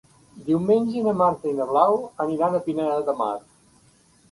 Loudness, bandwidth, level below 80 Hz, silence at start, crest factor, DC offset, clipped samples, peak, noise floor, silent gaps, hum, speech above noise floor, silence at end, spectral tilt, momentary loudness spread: -23 LUFS; 11.5 kHz; -62 dBFS; 0.35 s; 18 dB; under 0.1%; under 0.1%; -4 dBFS; -57 dBFS; none; none; 36 dB; 0.95 s; -8 dB/octave; 7 LU